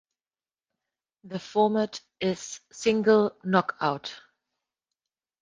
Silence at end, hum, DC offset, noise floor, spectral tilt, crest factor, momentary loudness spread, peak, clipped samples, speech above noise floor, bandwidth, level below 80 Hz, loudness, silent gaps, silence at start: 1.2 s; none; under 0.1%; under -90 dBFS; -5 dB/octave; 22 dB; 16 LU; -6 dBFS; under 0.1%; over 64 dB; 9.6 kHz; -68 dBFS; -26 LUFS; none; 1.25 s